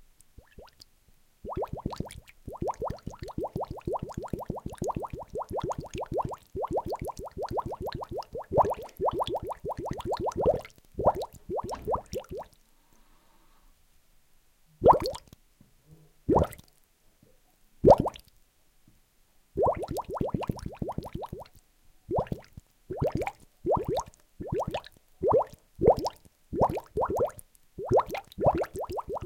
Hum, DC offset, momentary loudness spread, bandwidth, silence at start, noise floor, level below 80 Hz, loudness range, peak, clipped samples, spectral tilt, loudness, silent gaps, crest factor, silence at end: none; under 0.1%; 15 LU; 17 kHz; 0.6 s; -64 dBFS; -48 dBFS; 8 LU; -6 dBFS; under 0.1%; -7 dB/octave; -30 LUFS; none; 26 dB; 0 s